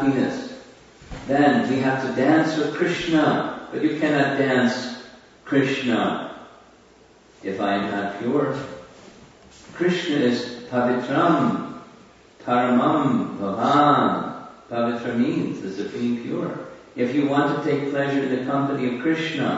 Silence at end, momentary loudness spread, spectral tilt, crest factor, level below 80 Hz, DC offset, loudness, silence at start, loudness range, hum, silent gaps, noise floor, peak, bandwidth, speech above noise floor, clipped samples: 0 s; 15 LU; -6.5 dB/octave; 18 dB; -58 dBFS; under 0.1%; -22 LUFS; 0 s; 5 LU; none; none; -52 dBFS; -6 dBFS; 8 kHz; 31 dB; under 0.1%